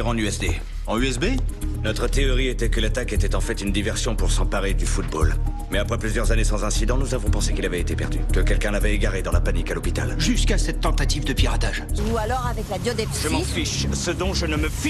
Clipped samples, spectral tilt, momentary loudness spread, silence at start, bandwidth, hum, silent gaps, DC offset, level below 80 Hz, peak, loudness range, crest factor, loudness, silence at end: under 0.1%; -4.5 dB/octave; 4 LU; 0 s; 13 kHz; none; none; under 0.1%; -24 dBFS; -6 dBFS; 1 LU; 14 dB; -24 LUFS; 0 s